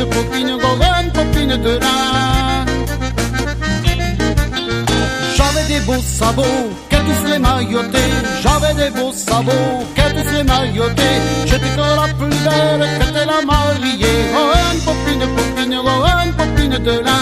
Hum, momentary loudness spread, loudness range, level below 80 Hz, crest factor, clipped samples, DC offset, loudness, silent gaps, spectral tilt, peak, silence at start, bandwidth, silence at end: none; 4 LU; 2 LU; -22 dBFS; 14 dB; under 0.1%; under 0.1%; -15 LUFS; none; -4.5 dB/octave; 0 dBFS; 0 s; 15.5 kHz; 0 s